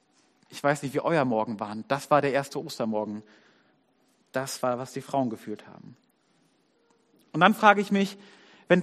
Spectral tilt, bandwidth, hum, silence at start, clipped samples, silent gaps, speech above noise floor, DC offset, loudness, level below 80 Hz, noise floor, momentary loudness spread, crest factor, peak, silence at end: -5.5 dB/octave; 14.5 kHz; none; 0.5 s; under 0.1%; none; 41 dB; under 0.1%; -26 LUFS; -74 dBFS; -67 dBFS; 16 LU; 24 dB; -2 dBFS; 0 s